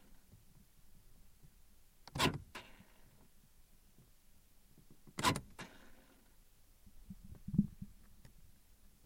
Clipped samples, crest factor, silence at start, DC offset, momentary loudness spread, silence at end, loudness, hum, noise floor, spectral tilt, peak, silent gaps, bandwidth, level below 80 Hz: under 0.1%; 28 dB; 0.1 s; under 0.1%; 28 LU; 0.55 s; -40 LUFS; none; -64 dBFS; -4 dB/octave; -18 dBFS; none; 16.5 kHz; -60 dBFS